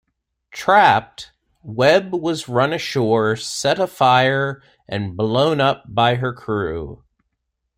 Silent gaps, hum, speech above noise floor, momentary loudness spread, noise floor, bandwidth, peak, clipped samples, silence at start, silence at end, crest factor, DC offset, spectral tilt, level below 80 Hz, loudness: none; none; 58 dB; 16 LU; -76 dBFS; 16 kHz; -2 dBFS; under 0.1%; 0.55 s; 0.8 s; 18 dB; under 0.1%; -5 dB/octave; -52 dBFS; -18 LUFS